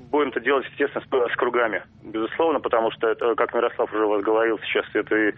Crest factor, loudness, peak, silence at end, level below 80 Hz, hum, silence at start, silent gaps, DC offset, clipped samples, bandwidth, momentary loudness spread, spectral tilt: 16 dB; -23 LUFS; -6 dBFS; 0 s; -62 dBFS; none; 0 s; none; under 0.1%; under 0.1%; 4 kHz; 5 LU; -2 dB/octave